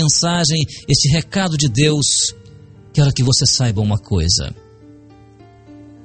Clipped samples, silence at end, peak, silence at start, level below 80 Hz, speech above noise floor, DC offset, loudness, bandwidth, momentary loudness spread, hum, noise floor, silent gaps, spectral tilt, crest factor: under 0.1%; 0.15 s; 0 dBFS; 0 s; -36 dBFS; 28 dB; under 0.1%; -15 LUFS; 9 kHz; 6 LU; none; -44 dBFS; none; -4 dB/octave; 16 dB